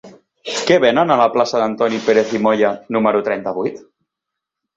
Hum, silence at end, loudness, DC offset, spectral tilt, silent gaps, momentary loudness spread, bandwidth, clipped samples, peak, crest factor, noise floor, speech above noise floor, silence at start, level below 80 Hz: none; 0.95 s; -16 LUFS; under 0.1%; -4.5 dB/octave; none; 10 LU; 8 kHz; under 0.1%; -2 dBFS; 16 dB; -81 dBFS; 66 dB; 0.05 s; -60 dBFS